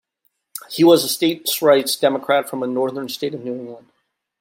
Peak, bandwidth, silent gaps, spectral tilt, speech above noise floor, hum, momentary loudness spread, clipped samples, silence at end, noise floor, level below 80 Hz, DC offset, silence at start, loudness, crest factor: -2 dBFS; 16.5 kHz; none; -4 dB/octave; 51 dB; none; 17 LU; under 0.1%; 0.6 s; -69 dBFS; -70 dBFS; under 0.1%; 0.55 s; -18 LUFS; 18 dB